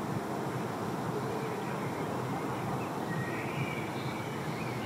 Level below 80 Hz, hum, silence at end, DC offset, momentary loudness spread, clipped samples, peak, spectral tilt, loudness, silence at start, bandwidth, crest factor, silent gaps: -66 dBFS; none; 0 s; under 0.1%; 2 LU; under 0.1%; -22 dBFS; -6 dB/octave; -35 LUFS; 0 s; 16 kHz; 14 dB; none